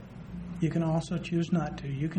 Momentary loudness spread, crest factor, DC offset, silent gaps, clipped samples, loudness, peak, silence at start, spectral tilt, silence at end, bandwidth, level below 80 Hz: 12 LU; 14 dB; under 0.1%; none; under 0.1%; -31 LUFS; -16 dBFS; 0 s; -7.5 dB/octave; 0 s; 9.2 kHz; -52 dBFS